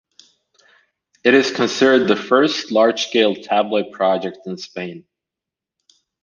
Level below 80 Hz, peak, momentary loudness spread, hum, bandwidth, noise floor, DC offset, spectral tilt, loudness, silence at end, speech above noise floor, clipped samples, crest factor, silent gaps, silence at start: -66 dBFS; -2 dBFS; 15 LU; none; 7.4 kHz; -86 dBFS; under 0.1%; -4 dB/octave; -17 LUFS; 1.2 s; 69 dB; under 0.1%; 18 dB; none; 1.25 s